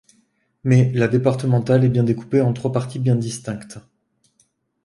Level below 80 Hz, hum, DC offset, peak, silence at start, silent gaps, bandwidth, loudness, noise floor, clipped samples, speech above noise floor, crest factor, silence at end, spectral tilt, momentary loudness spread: -54 dBFS; none; under 0.1%; -2 dBFS; 0.65 s; none; 11.5 kHz; -19 LUFS; -64 dBFS; under 0.1%; 46 dB; 18 dB; 1.05 s; -8 dB/octave; 12 LU